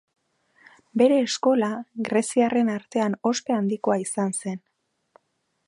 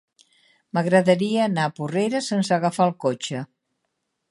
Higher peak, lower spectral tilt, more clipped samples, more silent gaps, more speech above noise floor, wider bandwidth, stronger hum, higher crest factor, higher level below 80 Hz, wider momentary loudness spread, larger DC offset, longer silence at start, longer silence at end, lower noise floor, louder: about the same, -6 dBFS vs -4 dBFS; about the same, -5 dB/octave vs -5.5 dB/octave; neither; neither; second, 51 dB vs 55 dB; about the same, 11.5 kHz vs 11.5 kHz; neither; about the same, 18 dB vs 20 dB; about the same, -74 dBFS vs -70 dBFS; about the same, 11 LU vs 11 LU; neither; first, 0.95 s vs 0.75 s; first, 1.1 s vs 0.85 s; about the same, -74 dBFS vs -77 dBFS; about the same, -24 LUFS vs -22 LUFS